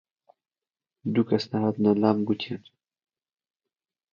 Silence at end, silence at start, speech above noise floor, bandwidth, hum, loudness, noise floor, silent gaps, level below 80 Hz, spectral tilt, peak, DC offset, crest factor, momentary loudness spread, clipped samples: 1.55 s; 1.05 s; over 66 dB; 7 kHz; none; -25 LUFS; under -90 dBFS; none; -68 dBFS; -8 dB/octave; -6 dBFS; under 0.1%; 22 dB; 13 LU; under 0.1%